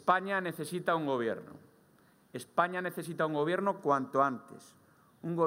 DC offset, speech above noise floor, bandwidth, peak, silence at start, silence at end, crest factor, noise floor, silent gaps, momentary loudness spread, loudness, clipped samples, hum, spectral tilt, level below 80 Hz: under 0.1%; 32 dB; 16 kHz; -12 dBFS; 0.05 s; 0 s; 22 dB; -65 dBFS; none; 15 LU; -32 LUFS; under 0.1%; none; -6 dB/octave; -80 dBFS